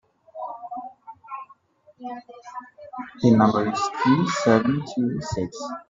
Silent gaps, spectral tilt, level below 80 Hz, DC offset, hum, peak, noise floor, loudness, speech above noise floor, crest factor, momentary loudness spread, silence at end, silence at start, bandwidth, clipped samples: none; -6.5 dB/octave; -58 dBFS; under 0.1%; none; -2 dBFS; -55 dBFS; -22 LUFS; 34 dB; 22 dB; 21 LU; 0.1 s; 0.35 s; 7.8 kHz; under 0.1%